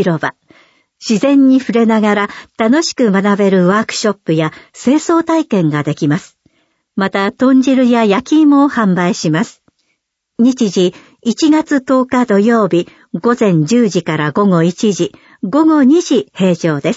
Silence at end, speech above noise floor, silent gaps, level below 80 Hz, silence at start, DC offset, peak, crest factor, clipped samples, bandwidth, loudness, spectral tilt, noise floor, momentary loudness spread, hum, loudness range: 0 s; 56 dB; none; -58 dBFS; 0 s; under 0.1%; 0 dBFS; 12 dB; under 0.1%; 8 kHz; -12 LUFS; -6 dB/octave; -68 dBFS; 9 LU; none; 3 LU